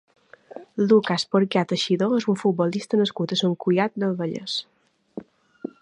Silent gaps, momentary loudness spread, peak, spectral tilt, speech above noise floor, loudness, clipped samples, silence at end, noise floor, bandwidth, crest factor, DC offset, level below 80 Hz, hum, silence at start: none; 22 LU; -6 dBFS; -6 dB/octave; 22 dB; -23 LUFS; under 0.1%; 0.6 s; -44 dBFS; 10.5 kHz; 18 dB; under 0.1%; -72 dBFS; none; 0.55 s